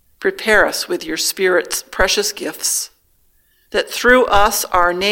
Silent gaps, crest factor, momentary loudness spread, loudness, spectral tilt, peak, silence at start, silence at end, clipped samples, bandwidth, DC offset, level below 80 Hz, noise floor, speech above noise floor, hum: none; 16 dB; 9 LU; -16 LUFS; -1.5 dB/octave; 0 dBFS; 0.2 s; 0 s; under 0.1%; 17.5 kHz; under 0.1%; -36 dBFS; -57 dBFS; 41 dB; none